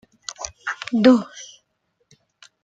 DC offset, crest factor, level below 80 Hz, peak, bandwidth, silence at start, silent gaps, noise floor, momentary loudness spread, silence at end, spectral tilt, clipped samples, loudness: under 0.1%; 20 dB; -60 dBFS; -2 dBFS; 7.8 kHz; 0.3 s; none; -71 dBFS; 23 LU; 1.2 s; -4.5 dB/octave; under 0.1%; -20 LUFS